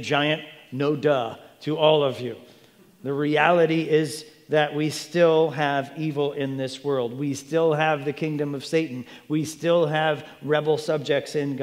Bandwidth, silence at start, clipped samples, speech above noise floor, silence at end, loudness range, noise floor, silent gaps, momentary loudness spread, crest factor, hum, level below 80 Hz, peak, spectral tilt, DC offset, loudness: 15.5 kHz; 0 s; under 0.1%; 30 dB; 0 s; 3 LU; -54 dBFS; none; 11 LU; 20 dB; none; -74 dBFS; -4 dBFS; -5.5 dB/octave; under 0.1%; -24 LUFS